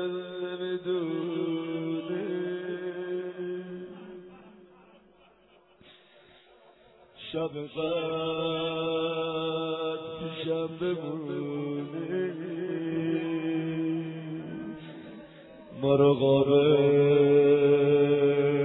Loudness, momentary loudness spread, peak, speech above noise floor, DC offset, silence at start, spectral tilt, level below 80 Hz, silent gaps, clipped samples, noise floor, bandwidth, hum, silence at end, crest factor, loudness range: -28 LUFS; 17 LU; -10 dBFS; 35 dB; under 0.1%; 0 s; -10.5 dB/octave; -68 dBFS; none; under 0.1%; -61 dBFS; 4.1 kHz; none; 0 s; 18 dB; 16 LU